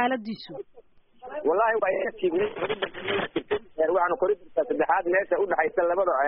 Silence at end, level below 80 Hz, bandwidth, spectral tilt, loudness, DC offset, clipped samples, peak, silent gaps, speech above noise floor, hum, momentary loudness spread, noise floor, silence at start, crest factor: 0 s; -60 dBFS; 4 kHz; -2.5 dB/octave; -26 LUFS; under 0.1%; under 0.1%; -8 dBFS; none; 27 dB; none; 8 LU; -53 dBFS; 0 s; 16 dB